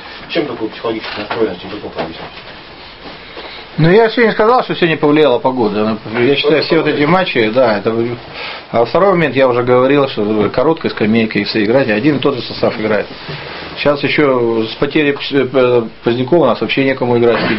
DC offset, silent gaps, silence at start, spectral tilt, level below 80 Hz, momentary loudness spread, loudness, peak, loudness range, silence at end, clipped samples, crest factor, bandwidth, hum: 0.4%; none; 0 s; -9 dB/octave; -44 dBFS; 14 LU; -13 LUFS; 0 dBFS; 4 LU; 0 s; under 0.1%; 14 dB; 5.8 kHz; none